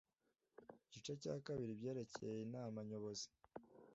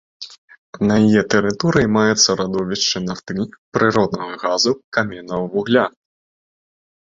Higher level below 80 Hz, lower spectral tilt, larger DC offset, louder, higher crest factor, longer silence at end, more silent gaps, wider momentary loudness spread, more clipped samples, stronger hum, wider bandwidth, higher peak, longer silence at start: second, -82 dBFS vs -50 dBFS; first, -6 dB/octave vs -4 dB/octave; neither; second, -49 LUFS vs -18 LUFS; about the same, 18 dB vs 18 dB; second, 0 s vs 1.15 s; second, none vs 0.38-0.48 s, 0.58-0.73 s, 3.58-3.72 s, 4.84-4.92 s; first, 17 LU vs 11 LU; neither; neither; about the same, 7.6 kHz vs 7.8 kHz; second, -32 dBFS vs -2 dBFS; first, 0.6 s vs 0.2 s